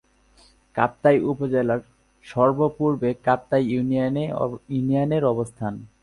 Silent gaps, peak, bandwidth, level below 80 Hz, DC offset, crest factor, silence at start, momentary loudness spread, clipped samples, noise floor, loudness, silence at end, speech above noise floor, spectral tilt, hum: none; -4 dBFS; 11.5 kHz; -56 dBFS; under 0.1%; 18 dB; 0.75 s; 9 LU; under 0.1%; -56 dBFS; -23 LUFS; 0.15 s; 34 dB; -8.5 dB/octave; none